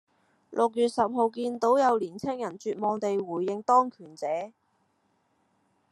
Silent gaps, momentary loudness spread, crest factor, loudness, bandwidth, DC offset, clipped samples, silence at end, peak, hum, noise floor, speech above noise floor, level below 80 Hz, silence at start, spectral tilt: none; 11 LU; 18 dB; -27 LUFS; 12 kHz; under 0.1%; under 0.1%; 1.45 s; -10 dBFS; none; -71 dBFS; 45 dB; -76 dBFS; 0.5 s; -5.5 dB/octave